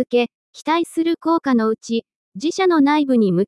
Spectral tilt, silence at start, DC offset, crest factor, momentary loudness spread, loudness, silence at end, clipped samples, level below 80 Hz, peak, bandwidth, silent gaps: -6 dB/octave; 0 s; under 0.1%; 14 dB; 10 LU; -19 LUFS; 0 s; under 0.1%; -68 dBFS; -6 dBFS; 12 kHz; 0.35-0.53 s, 2.16-2.32 s